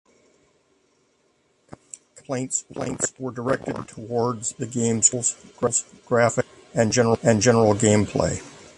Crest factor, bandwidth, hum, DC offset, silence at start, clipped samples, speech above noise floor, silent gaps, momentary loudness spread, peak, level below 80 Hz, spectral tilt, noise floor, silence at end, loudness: 20 dB; 11.5 kHz; none; under 0.1%; 2.3 s; under 0.1%; 43 dB; none; 14 LU; -2 dBFS; -50 dBFS; -4.5 dB/octave; -65 dBFS; 0.15 s; -22 LUFS